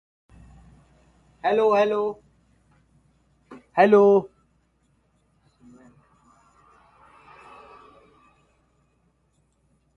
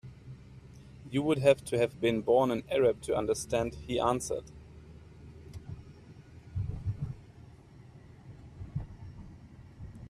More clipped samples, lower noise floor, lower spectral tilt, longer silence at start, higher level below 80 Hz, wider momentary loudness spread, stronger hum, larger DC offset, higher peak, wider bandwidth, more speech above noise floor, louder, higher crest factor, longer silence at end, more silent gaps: neither; first, -67 dBFS vs -53 dBFS; first, -7 dB/octave vs -5.5 dB/octave; first, 1.45 s vs 0.05 s; second, -64 dBFS vs -52 dBFS; about the same, 28 LU vs 26 LU; neither; neither; first, -4 dBFS vs -10 dBFS; second, 6.6 kHz vs 14.5 kHz; first, 49 dB vs 24 dB; first, -20 LUFS vs -31 LUFS; about the same, 22 dB vs 22 dB; first, 5.7 s vs 0 s; neither